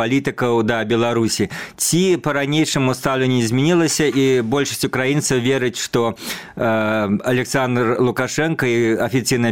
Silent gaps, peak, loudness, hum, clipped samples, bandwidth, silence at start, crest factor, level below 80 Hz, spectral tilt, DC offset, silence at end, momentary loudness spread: none; -4 dBFS; -18 LUFS; none; under 0.1%; 17 kHz; 0 s; 14 dB; -50 dBFS; -4.5 dB/octave; 0.3%; 0 s; 4 LU